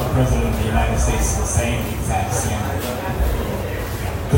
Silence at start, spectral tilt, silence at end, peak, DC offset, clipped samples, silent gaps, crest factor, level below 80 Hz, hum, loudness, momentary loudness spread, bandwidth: 0 s; -5 dB/octave; 0 s; -4 dBFS; under 0.1%; under 0.1%; none; 16 dB; -24 dBFS; none; -21 LUFS; 6 LU; 16.5 kHz